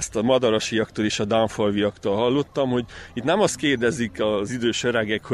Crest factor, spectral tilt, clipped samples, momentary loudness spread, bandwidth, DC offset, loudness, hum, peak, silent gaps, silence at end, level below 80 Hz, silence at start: 16 dB; -4.5 dB/octave; under 0.1%; 4 LU; 12.5 kHz; under 0.1%; -22 LUFS; none; -6 dBFS; none; 0 s; -52 dBFS; 0 s